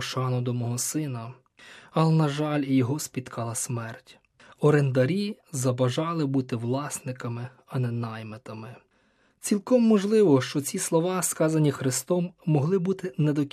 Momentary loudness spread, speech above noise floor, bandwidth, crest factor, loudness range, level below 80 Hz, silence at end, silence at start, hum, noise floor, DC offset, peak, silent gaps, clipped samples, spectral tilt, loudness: 14 LU; 40 dB; 14.5 kHz; 18 dB; 6 LU; -72 dBFS; 0.05 s; 0 s; none; -65 dBFS; under 0.1%; -8 dBFS; none; under 0.1%; -6 dB/octave; -26 LUFS